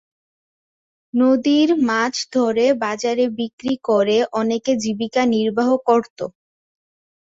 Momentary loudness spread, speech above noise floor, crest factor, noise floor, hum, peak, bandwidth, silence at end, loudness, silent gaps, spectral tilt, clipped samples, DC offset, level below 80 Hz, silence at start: 8 LU; over 72 dB; 16 dB; under -90 dBFS; none; -4 dBFS; 7.8 kHz; 1 s; -19 LUFS; 3.53-3.58 s, 6.10-6.16 s; -4.5 dB/octave; under 0.1%; under 0.1%; -62 dBFS; 1.15 s